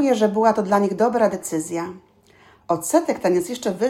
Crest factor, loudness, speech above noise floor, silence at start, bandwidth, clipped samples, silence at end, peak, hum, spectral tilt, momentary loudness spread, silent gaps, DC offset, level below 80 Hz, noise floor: 16 dB; -20 LUFS; 33 dB; 0 s; 16 kHz; under 0.1%; 0 s; -4 dBFS; none; -5 dB/octave; 9 LU; none; under 0.1%; -62 dBFS; -53 dBFS